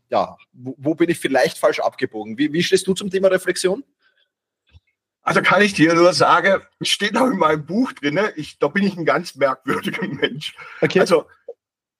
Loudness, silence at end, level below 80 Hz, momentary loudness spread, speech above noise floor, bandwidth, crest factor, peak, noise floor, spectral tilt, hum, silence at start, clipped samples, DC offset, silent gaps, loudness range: -18 LUFS; 0.5 s; -62 dBFS; 11 LU; 50 dB; 15.5 kHz; 18 dB; -2 dBFS; -69 dBFS; -4.5 dB/octave; none; 0.1 s; under 0.1%; under 0.1%; none; 5 LU